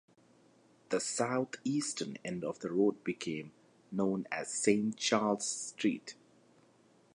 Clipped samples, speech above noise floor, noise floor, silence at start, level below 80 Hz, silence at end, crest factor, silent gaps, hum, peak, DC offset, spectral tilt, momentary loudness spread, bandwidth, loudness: under 0.1%; 32 dB; -66 dBFS; 0.9 s; -78 dBFS; 1 s; 22 dB; none; none; -14 dBFS; under 0.1%; -4 dB/octave; 10 LU; 11.5 kHz; -34 LUFS